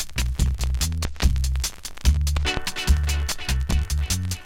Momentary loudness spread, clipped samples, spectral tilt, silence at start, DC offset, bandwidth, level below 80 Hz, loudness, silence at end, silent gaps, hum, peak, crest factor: 4 LU; under 0.1%; -3.5 dB/octave; 0 s; under 0.1%; 16.5 kHz; -24 dBFS; -24 LUFS; 0 s; none; none; -6 dBFS; 18 dB